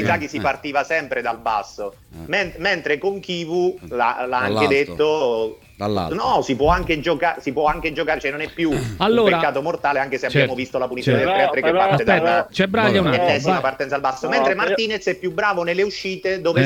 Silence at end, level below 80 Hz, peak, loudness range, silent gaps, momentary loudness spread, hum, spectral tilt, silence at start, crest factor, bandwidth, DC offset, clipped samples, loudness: 0 s; -42 dBFS; 0 dBFS; 5 LU; none; 7 LU; none; -5.5 dB/octave; 0 s; 20 dB; 17 kHz; under 0.1%; under 0.1%; -20 LUFS